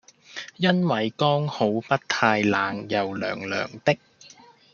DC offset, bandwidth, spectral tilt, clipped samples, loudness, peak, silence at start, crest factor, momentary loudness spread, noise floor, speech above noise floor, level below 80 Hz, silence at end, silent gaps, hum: under 0.1%; 7.2 kHz; -5.5 dB/octave; under 0.1%; -24 LUFS; -2 dBFS; 0.3 s; 22 dB; 8 LU; -51 dBFS; 28 dB; -68 dBFS; 0.45 s; none; none